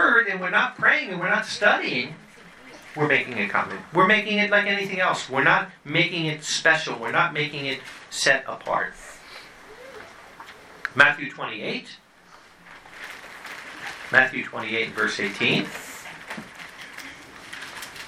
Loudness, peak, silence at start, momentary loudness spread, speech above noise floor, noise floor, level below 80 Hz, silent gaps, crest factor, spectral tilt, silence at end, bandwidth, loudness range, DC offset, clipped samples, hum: -22 LUFS; 0 dBFS; 0 s; 22 LU; 28 dB; -51 dBFS; -64 dBFS; none; 24 dB; -3.5 dB/octave; 0 s; 15.5 kHz; 6 LU; under 0.1%; under 0.1%; none